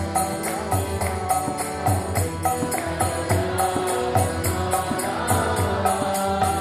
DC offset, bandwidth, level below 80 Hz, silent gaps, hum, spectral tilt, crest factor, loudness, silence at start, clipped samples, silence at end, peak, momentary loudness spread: under 0.1%; 14 kHz; -40 dBFS; none; none; -4.5 dB/octave; 16 dB; -23 LUFS; 0 s; under 0.1%; 0 s; -6 dBFS; 3 LU